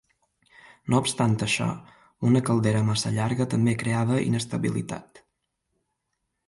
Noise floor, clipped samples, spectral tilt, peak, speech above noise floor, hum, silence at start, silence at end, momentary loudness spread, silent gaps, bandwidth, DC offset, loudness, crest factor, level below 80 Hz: -79 dBFS; under 0.1%; -5.5 dB/octave; -10 dBFS; 55 dB; none; 0.85 s; 1.45 s; 9 LU; none; 11.5 kHz; under 0.1%; -25 LUFS; 16 dB; -58 dBFS